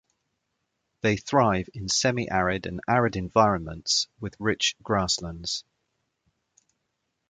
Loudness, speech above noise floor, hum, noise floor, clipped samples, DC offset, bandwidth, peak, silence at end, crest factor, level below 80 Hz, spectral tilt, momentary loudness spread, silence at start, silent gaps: -25 LUFS; 53 dB; none; -79 dBFS; under 0.1%; under 0.1%; 9.6 kHz; -4 dBFS; 1.7 s; 22 dB; -50 dBFS; -3.5 dB/octave; 8 LU; 1.05 s; none